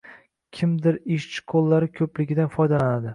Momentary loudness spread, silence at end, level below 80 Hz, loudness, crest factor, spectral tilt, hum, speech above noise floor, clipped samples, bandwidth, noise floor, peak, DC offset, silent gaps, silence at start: 7 LU; 0 s; -58 dBFS; -23 LUFS; 14 dB; -8 dB/octave; none; 28 dB; under 0.1%; 10.5 kHz; -50 dBFS; -8 dBFS; under 0.1%; none; 0.05 s